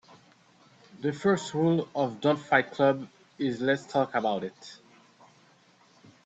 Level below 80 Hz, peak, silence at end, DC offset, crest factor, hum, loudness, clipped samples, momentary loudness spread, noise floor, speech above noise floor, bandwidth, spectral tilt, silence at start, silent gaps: -72 dBFS; -8 dBFS; 1.5 s; under 0.1%; 22 dB; none; -28 LUFS; under 0.1%; 10 LU; -61 dBFS; 34 dB; 8.6 kHz; -6 dB/octave; 0.95 s; none